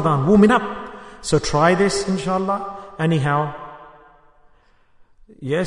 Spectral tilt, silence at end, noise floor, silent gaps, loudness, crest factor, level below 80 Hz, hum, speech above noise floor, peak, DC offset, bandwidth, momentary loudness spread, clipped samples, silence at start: -6 dB/octave; 0 s; -54 dBFS; none; -19 LUFS; 18 dB; -44 dBFS; none; 37 dB; -2 dBFS; under 0.1%; 11 kHz; 19 LU; under 0.1%; 0 s